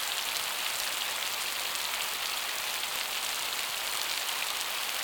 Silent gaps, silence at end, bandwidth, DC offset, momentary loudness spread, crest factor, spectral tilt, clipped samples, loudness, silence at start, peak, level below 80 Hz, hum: none; 0 s; over 20 kHz; under 0.1%; 1 LU; 22 dB; 2 dB/octave; under 0.1%; -30 LUFS; 0 s; -10 dBFS; -68 dBFS; none